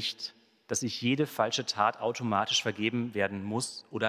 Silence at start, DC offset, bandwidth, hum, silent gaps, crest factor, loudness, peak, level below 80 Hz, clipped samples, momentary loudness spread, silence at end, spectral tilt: 0 s; under 0.1%; 16 kHz; none; none; 20 dB; -30 LUFS; -10 dBFS; -66 dBFS; under 0.1%; 7 LU; 0 s; -3.5 dB/octave